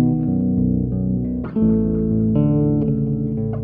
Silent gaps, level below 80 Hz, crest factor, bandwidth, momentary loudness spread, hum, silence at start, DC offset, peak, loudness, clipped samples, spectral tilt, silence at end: none; -34 dBFS; 12 dB; 3 kHz; 5 LU; none; 0 s; under 0.1%; -6 dBFS; -19 LUFS; under 0.1%; -14.5 dB/octave; 0 s